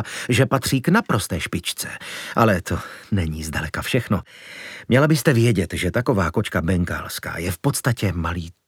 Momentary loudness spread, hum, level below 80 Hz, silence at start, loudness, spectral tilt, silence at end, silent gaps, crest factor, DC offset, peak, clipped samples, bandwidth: 11 LU; none; -40 dBFS; 0 s; -21 LUFS; -5.5 dB/octave; 0.15 s; none; 20 dB; under 0.1%; 0 dBFS; under 0.1%; 18 kHz